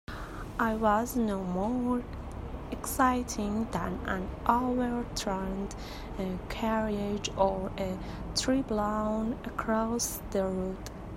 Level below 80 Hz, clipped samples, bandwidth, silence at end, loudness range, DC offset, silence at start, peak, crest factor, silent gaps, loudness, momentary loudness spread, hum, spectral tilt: -44 dBFS; under 0.1%; 16 kHz; 0 s; 2 LU; under 0.1%; 0.1 s; -8 dBFS; 22 dB; none; -31 LUFS; 11 LU; none; -5 dB/octave